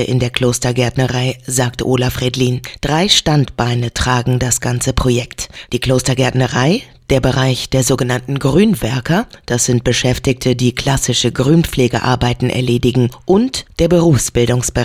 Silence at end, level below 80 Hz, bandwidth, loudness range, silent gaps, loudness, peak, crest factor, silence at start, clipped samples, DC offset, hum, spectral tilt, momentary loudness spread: 0 s; -32 dBFS; 16 kHz; 1 LU; none; -15 LUFS; 0 dBFS; 14 dB; 0 s; under 0.1%; under 0.1%; none; -4.5 dB/octave; 5 LU